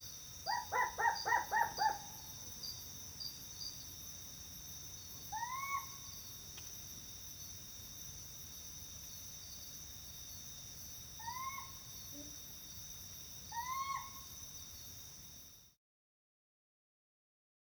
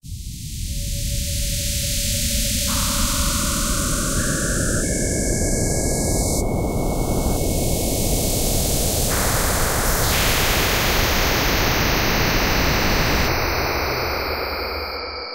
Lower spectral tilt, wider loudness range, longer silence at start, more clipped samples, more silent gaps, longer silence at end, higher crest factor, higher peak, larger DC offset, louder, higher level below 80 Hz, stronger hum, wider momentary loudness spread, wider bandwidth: second, -1 dB/octave vs -3 dB/octave; first, 9 LU vs 3 LU; about the same, 0 s vs 0.05 s; neither; neither; first, 2.05 s vs 0 s; first, 24 dB vs 14 dB; second, -22 dBFS vs -6 dBFS; second, under 0.1% vs 0.4%; second, -43 LUFS vs -20 LUFS; second, -66 dBFS vs -26 dBFS; neither; first, 12 LU vs 6 LU; first, over 20 kHz vs 16 kHz